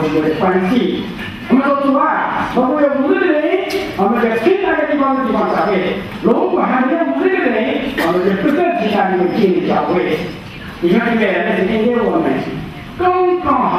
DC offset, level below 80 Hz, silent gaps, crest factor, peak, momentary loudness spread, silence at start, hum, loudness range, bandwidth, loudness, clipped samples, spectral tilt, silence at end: under 0.1%; -44 dBFS; none; 14 dB; 0 dBFS; 6 LU; 0 s; none; 1 LU; 14.5 kHz; -15 LUFS; under 0.1%; -7 dB/octave; 0 s